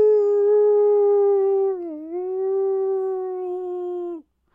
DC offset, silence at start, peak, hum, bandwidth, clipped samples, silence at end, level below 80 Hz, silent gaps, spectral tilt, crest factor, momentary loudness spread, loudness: under 0.1%; 0 s; -12 dBFS; none; 2.2 kHz; under 0.1%; 0.35 s; -70 dBFS; none; -8 dB/octave; 10 dB; 13 LU; -21 LUFS